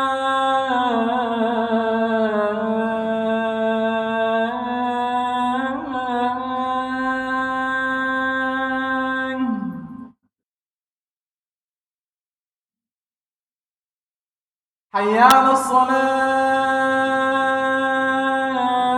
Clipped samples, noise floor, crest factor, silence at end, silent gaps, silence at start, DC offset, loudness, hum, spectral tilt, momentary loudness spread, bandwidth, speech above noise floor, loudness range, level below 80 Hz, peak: under 0.1%; under -90 dBFS; 20 dB; 0 s; 10.45-10.58 s, 10.65-10.84 s, 10.90-12.11 s, 12.17-12.45 s, 12.54-12.68 s, 12.92-13.05 s, 13.21-13.25 s, 13.33-14.90 s; 0 s; under 0.1%; -20 LUFS; none; -4.5 dB/octave; 6 LU; 16 kHz; over 75 dB; 9 LU; -60 dBFS; 0 dBFS